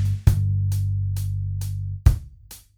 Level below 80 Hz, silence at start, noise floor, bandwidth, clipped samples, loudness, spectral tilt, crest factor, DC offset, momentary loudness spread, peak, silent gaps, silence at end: -28 dBFS; 0 s; -46 dBFS; 16.5 kHz; under 0.1%; -24 LUFS; -7 dB/octave; 20 dB; under 0.1%; 11 LU; -2 dBFS; none; 0.2 s